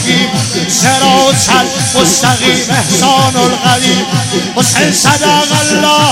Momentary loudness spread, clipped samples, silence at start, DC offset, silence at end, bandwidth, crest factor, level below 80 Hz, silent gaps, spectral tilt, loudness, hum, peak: 4 LU; under 0.1%; 0 s; under 0.1%; 0 s; 18.5 kHz; 10 dB; -42 dBFS; none; -3 dB/octave; -8 LUFS; none; 0 dBFS